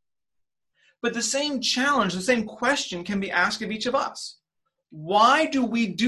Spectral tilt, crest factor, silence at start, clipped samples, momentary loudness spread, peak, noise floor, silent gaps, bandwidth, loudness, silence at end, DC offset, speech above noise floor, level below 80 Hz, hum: -3 dB/octave; 18 dB; 1.05 s; under 0.1%; 11 LU; -6 dBFS; -82 dBFS; none; 12.5 kHz; -23 LUFS; 0 s; under 0.1%; 58 dB; -62 dBFS; none